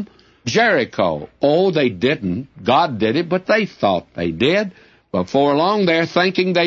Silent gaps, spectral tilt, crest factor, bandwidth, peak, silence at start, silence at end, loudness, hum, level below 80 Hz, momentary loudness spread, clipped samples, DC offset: none; -5.5 dB/octave; 16 dB; 7.6 kHz; -2 dBFS; 0 s; 0 s; -18 LUFS; none; -54 dBFS; 9 LU; under 0.1%; under 0.1%